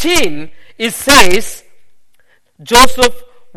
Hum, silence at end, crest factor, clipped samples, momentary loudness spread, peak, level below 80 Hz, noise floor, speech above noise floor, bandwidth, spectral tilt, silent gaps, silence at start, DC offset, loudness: none; 0 s; 12 dB; 0.9%; 13 LU; 0 dBFS; -30 dBFS; -52 dBFS; 42 dB; over 20 kHz; -2 dB/octave; none; 0 s; under 0.1%; -10 LUFS